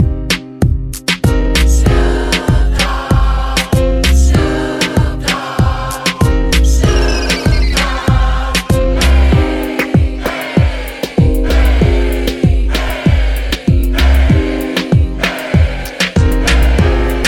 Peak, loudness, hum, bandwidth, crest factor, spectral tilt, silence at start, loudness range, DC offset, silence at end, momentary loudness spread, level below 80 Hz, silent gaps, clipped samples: 0 dBFS; -13 LUFS; none; 17 kHz; 10 dB; -5.5 dB/octave; 0 s; 1 LU; under 0.1%; 0 s; 5 LU; -14 dBFS; none; under 0.1%